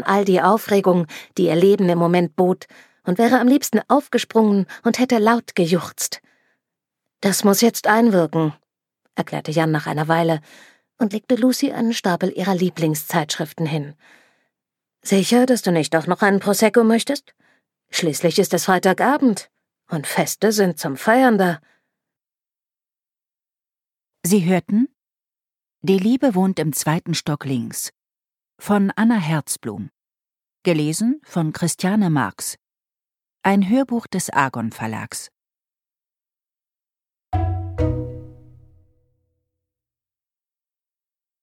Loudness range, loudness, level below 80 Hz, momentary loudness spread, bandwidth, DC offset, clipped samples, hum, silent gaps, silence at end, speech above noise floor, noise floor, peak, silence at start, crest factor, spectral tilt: 9 LU; -19 LUFS; -48 dBFS; 12 LU; 16.5 kHz; under 0.1%; under 0.1%; none; none; 3.1 s; over 72 dB; under -90 dBFS; -2 dBFS; 0 s; 18 dB; -5 dB/octave